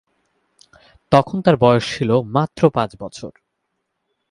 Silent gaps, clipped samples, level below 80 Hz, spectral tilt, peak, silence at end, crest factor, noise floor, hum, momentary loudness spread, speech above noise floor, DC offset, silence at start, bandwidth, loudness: none; under 0.1%; -50 dBFS; -7 dB/octave; 0 dBFS; 1 s; 20 dB; -74 dBFS; none; 18 LU; 58 dB; under 0.1%; 1.1 s; 11.5 kHz; -17 LUFS